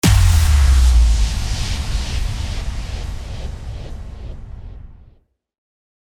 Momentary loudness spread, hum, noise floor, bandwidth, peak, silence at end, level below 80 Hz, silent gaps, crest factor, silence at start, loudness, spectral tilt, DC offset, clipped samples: 21 LU; none; -54 dBFS; 17 kHz; -4 dBFS; 1.15 s; -18 dBFS; none; 14 dB; 0.05 s; -18 LUFS; -4.5 dB/octave; under 0.1%; under 0.1%